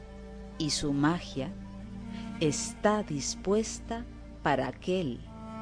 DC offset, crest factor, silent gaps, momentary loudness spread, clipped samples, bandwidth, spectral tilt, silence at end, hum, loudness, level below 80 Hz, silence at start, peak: under 0.1%; 20 dB; none; 15 LU; under 0.1%; 10.5 kHz; -4.5 dB/octave; 0 s; none; -31 LUFS; -48 dBFS; 0 s; -12 dBFS